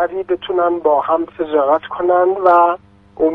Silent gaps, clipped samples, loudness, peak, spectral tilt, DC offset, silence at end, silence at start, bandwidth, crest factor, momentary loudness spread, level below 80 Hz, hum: none; under 0.1%; -15 LUFS; 0 dBFS; -7.5 dB/octave; under 0.1%; 0 s; 0 s; 4.5 kHz; 14 dB; 7 LU; -54 dBFS; none